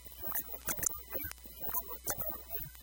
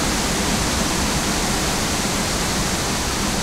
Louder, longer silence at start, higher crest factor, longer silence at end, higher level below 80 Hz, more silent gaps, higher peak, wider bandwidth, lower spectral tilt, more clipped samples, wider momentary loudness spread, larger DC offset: second, -36 LUFS vs -20 LUFS; about the same, 0 s vs 0 s; first, 26 dB vs 12 dB; about the same, 0 s vs 0 s; second, -54 dBFS vs -30 dBFS; neither; second, -14 dBFS vs -8 dBFS; about the same, 17.5 kHz vs 16 kHz; about the same, -2 dB/octave vs -3 dB/octave; neither; first, 6 LU vs 1 LU; neither